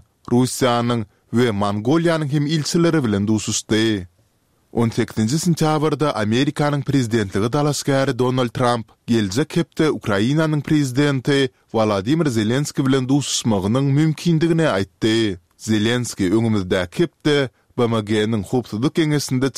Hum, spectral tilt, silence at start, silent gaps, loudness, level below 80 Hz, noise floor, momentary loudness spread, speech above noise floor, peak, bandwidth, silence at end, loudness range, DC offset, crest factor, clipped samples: none; -5.5 dB/octave; 0.3 s; none; -19 LUFS; -52 dBFS; -62 dBFS; 4 LU; 43 dB; -2 dBFS; 15.5 kHz; 0.05 s; 2 LU; 0.2%; 16 dB; under 0.1%